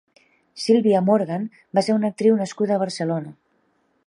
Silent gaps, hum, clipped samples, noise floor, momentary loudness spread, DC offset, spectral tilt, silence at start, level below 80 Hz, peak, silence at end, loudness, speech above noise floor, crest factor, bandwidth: none; none; under 0.1%; -66 dBFS; 11 LU; under 0.1%; -6.5 dB/octave; 0.55 s; -72 dBFS; -4 dBFS; 0.75 s; -21 LUFS; 46 dB; 16 dB; 11 kHz